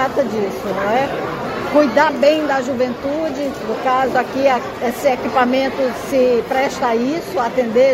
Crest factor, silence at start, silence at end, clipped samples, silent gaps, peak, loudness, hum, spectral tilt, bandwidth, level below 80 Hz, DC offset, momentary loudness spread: 16 dB; 0 s; 0 s; under 0.1%; none; 0 dBFS; -17 LUFS; none; -5 dB/octave; 16 kHz; -48 dBFS; under 0.1%; 7 LU